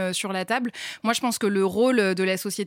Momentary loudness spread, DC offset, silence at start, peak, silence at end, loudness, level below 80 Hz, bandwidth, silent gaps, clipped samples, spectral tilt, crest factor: 6 LU; under 0.1%; 0 s; -10 dBFS; 0 s; -24 LUFS; -72 dBFS; 16.5 kHz; none; under 0.1%; -4 dB/octave; 14 dB